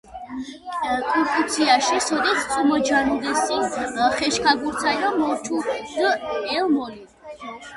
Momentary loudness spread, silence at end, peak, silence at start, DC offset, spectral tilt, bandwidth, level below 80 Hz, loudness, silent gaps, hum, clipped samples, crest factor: 15 LU; 0 s; -4 dBFS; 0.05 s; under 0.1%; -2 dB/octave; 11.5 kHz; -54 dBFS; -21 LUFS; none; none; under 0.1%; 18 dB